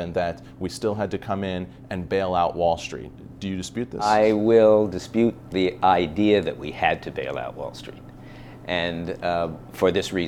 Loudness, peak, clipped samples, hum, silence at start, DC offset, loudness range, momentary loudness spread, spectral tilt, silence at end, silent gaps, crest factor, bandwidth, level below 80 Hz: -23 LUFS; -4 dBFS; under 0.1%; none; 0 s; under 0.1%; 7 LU; 16 LU; -6 dB/octave; 0 s; none; 20 dB; 15 kHz; -50 dBFS